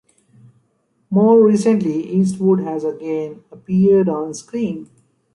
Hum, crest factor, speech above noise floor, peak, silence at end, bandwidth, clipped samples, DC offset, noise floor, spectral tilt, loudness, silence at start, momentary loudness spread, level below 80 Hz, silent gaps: none; 14 dB; 48 dB; -2 dBFS; 0.5 s; 11.5 kHz; under 0.1%; under 0.1%; -64 dBFS; -8 dB/octave; -17 LUFS; 1.1 s; 13 LU; -60 dBFS; none